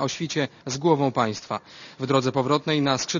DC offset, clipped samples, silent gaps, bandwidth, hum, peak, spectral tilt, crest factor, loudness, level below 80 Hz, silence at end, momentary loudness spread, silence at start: under 0.1%; under 0.1%; none; 7.4 kHz; none; -6 dBFS; -5 dB/octave; 18 dB; -24 LUFS; -64 dBFS; 0 s; 11 LU; 0 s